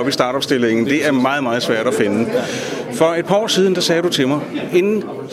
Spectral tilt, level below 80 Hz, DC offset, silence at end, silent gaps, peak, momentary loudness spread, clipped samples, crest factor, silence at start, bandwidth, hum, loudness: -4.5 dB/octave; -60 dBFS; under 0.1%; 0 s; none; 0 dBFS; 6 LU; under 0.1%; 16 dB; 0 s; 15 kHz; none; -17 LUFS